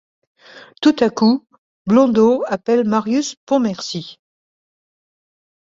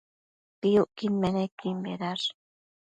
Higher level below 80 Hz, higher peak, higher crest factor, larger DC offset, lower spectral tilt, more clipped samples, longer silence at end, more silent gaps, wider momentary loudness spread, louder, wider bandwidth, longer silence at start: about the same, -60 dBFS vs -64 dBFS; first, -2 dBFS vs -12 dBFS; about the same, 16 dB vs 18 dB; neither; about the same, -5.5 dB/octave vs -6.5 dB/octave; neither; first, 1.55 s vs 0.65 s; first, 1.58-1.85 s, 3.37-3.47 s vs 1.52-1.57 s; first, 12 LU vs 8 LU; first, -17 LUFS vs -29 LUFS; second, 7.6 kHz vs 9 kHz; about the same, 0.55 s vs 0.65 s